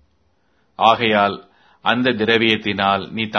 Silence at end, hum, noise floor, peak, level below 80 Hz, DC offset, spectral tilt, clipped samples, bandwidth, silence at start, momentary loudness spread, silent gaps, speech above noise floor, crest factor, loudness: 0 s; none; -63 dBFS; 0 dBFS; -58 dBFS; under 0.1%; -6 dB/octave; under 0.1%; 6.4 kHz; 0.8 s; 6 LU; none; 46 dB; 18 dB; -17 LUFS